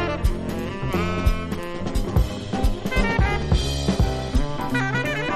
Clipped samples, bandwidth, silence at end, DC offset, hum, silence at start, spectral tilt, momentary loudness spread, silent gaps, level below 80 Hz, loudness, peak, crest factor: under 0.1%; 13.5 kHz; 0 s; under 0.1%; none; 0 s; -6 dB/octave; 6 LU; none; -26 dBFS; -24 LUFS; -6 dBFS; 16 dB